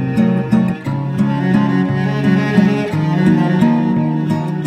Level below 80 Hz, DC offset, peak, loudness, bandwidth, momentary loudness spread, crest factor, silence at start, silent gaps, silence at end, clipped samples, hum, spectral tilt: -48 dBFS; under 0.1%; 0 dBFS; -15 LUFS; 9.2 kHz; 5 LU; 14 dB; 0 s; none; 0 s; under 0.1%; none; -8.5 dB/octave